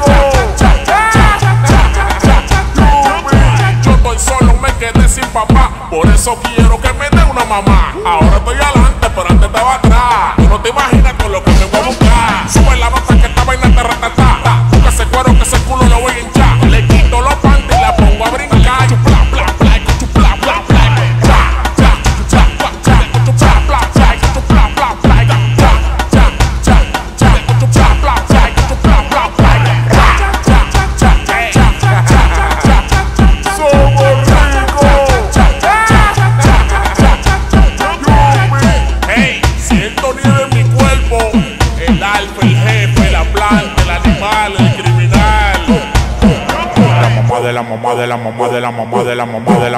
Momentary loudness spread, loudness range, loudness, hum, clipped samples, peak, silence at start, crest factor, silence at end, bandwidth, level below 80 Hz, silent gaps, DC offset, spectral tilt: 4 LU; 2 LU; -10 LUFS; none; under 0.1%; 0 dBFS; 0 s; 8 dB; 0 s; 14 kHz; -12 dBFS; none; under 0.1%; -5.5 dB/octave